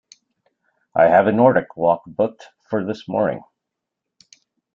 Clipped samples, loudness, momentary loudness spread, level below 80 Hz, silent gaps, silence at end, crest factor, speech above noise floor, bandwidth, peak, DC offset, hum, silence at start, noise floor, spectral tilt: under 0.1%; -19 LUFS; 12 LU; -62 dBFS; none; 1.35 s; 20 dB; 64 dB; 7.2 kHz; -2 dBFS; under 0.1%; none; 0.95 s; -82 dBFS; -8 dB/octave